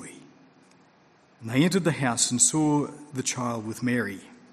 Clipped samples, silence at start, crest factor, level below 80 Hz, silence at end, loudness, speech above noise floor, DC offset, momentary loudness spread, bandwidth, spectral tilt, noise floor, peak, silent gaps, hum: under 0.1%; 0 s; 20 dB; -66 dBFS; 0.3 s; -25 LUFS; 34 dB; under 0.1%; 14 LU; 14 kHz; -3.5 dB/octave; -59 dBFS; -8 dBFS; none; none